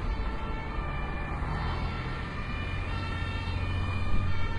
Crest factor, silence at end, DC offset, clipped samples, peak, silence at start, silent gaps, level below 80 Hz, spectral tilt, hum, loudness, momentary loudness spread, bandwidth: 14 dB; 0 s; under 0.1%; under 0.1%; -16 dBFS; 0 s; none; -34 dBFS; -7 dB/octave; none; -34 LUFS; 3 LU; 10.5 kHz